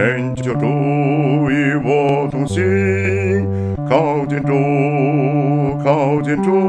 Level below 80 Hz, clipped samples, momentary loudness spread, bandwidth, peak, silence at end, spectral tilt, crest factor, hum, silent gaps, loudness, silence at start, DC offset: -46 dBFS; under 0.1%; 3 LU; 9.8 kHz; 0 dBFS; 0 s; -8 dB/octave; 16 dB; none; none; -16 LUFS; 0 s; under 0.1%